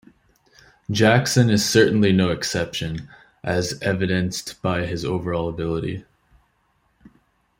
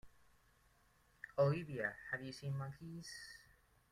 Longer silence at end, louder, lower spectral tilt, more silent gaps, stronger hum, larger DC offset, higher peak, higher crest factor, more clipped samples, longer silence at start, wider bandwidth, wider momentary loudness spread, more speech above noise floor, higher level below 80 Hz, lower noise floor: first, 1.6 s vs 0.5 s; first, -21 LUFS vs -42 LUFS; second, -5 dB/octave vs -6.5 dB/octave; neither; neither; neither; first, -2 dBFS vs -22 dBFS; about the same, 20 dB vs 22 dB; neither; first, 0.9 s vs 0.05 s; first, 16 kHz vs 14 kHz; second, 13 LU vs 18 LU; first, 45 dB vs 31 dB; first, -50 dBFS vs -72 dBFS; second, -66 dBFS vs -73 dBFS